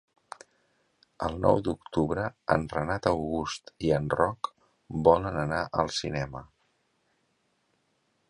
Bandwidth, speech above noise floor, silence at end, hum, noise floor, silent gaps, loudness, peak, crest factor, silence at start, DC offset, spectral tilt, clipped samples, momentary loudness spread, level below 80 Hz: 11 kHz; 45 dB; 1.85 s; none; -73 dBFS; none; -28 LUFS; -6 dBFS; 24 dB; 1.2 s; under 0.1%; -6 dB/octave; under 0.1%; 13 LU; -50 dBFS